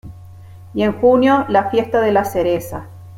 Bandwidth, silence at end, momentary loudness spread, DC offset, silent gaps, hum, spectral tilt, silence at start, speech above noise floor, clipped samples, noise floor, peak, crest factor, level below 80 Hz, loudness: 16.5 kHz; 0 s; 13 LU; under 0.1%; none; none; -6.5 dB/octave; 0.05 s; 22 dB; under 0.1%; -38 dBFS; -2 dBFS; 14 dB; -48 dBFS; -16 LUFS